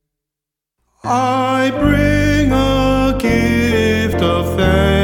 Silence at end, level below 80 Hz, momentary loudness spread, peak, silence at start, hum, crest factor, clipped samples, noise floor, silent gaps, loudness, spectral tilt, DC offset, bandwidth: 0 s; -26 dBFS; 3 LU; 0 dBFS; 1.05 s; none; 14 dB; under 0.1%; -84 dBFS; none; -14 LUFS; -6 dB/octave; under 0.1%; 17.5 kHz